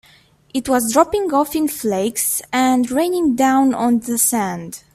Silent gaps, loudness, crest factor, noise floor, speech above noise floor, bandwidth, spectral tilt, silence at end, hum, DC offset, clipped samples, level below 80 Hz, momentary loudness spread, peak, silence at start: none; -17 LUFS; 16 dB; -52 dBFS; 34 dB; 16 kHz; -3.5 dB/octave; 0.15 s; none; under 0.1%; under 0.1%; -52 dBFS; 6 LU; 0 dBFS; 0.55 s